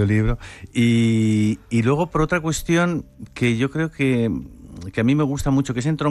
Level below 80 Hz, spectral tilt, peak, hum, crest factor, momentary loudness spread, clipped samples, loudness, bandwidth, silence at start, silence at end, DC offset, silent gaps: -36 dBFS; -6.5 dB/octave; -6 dBFS; none; 12 dB; 11 LU; under 0.1%; -21 LUFS; 13.5 kHz; 0 s; 0 s; under 0.1%; none